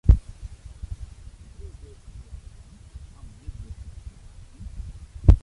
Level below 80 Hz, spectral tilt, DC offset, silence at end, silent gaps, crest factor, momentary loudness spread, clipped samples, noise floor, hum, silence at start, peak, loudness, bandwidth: -28 dBFS; -9 dB/octave; under 0.1%; 0.05 s; none; 24 dB; 23 LU; under 0.1%; -45 dBFS; none; 0.05 s; -2 dBFS; -29 LUFS; 10.5 kHz